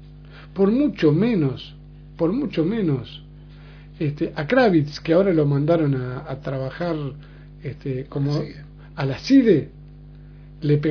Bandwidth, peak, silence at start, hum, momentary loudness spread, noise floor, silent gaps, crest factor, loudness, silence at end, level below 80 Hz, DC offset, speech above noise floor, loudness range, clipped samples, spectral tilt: 5.4 kHz; -4 dBFS; 0 s; 50 Hz at -40 dBFS; 18 LU; -42 dBFS; none; 18 dB; -21 LUFS; 0 s; -46 dBFS; under 0.1%; 21 dB; 5 LU; under 0.1%; -8.5 dB/octave